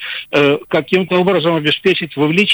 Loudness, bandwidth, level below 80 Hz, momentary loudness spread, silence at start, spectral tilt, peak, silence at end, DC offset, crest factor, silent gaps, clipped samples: -14 LUFS; over 20 kHz; -54 dBFS; 2 LU; 0 s; -6 dB/octave; -2 dBFS; 0 s; under 0.1%; 12 dB; none; under 0.1%